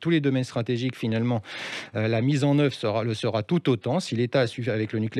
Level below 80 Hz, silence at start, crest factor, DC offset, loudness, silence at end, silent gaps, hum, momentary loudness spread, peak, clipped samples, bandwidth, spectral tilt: -68 dBFS; 0 s; 16 dB; under 0.1%; -25 LUFS; 0 s; none; none; 6 LU; -10 dBFS; under 0.1%; 12 kHz; -7 dB/octave